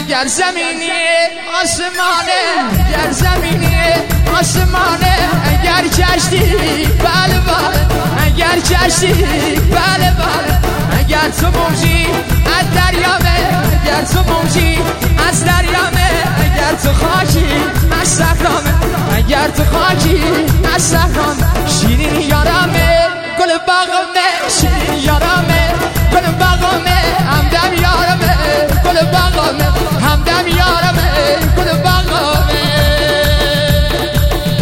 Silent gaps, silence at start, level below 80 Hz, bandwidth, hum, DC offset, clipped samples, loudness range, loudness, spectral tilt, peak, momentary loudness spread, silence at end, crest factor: none; 0 s; -18 dBFS; 17 kHz; none; under 0.1%; under 0.1%; 1 LU; -12 LUFS; -4.5 dB/octave; 0 dBFS; 3 LU; 0 s; 12 dB